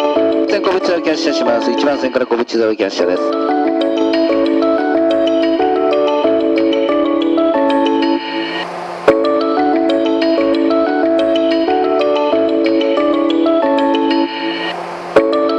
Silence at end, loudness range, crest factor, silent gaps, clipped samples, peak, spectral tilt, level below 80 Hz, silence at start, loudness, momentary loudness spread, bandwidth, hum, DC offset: 0 s; 1 LU; 14 dB; none; under 0.1%; 0 dBFS; -4.5 dB/octave; -52 dBFS; 0 s; -14 LUFS; 3 LU; 8.6 kHz; none; under 0.1%